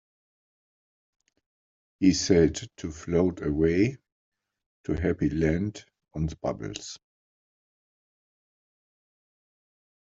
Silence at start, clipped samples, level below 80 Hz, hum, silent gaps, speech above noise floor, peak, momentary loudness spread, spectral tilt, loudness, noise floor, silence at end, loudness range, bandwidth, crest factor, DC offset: 2 s; under 0.1%; -48 dBFS; none; 4.12-4.32 s, 4.66-4.84 s; over 64 dB; -8 dBFS; 17 LU; -6 dB/octave; -26 LUFS; under -90 dBFS; 3.1 s; 12 LU; 8 kHz; 22 dB; under 0.1%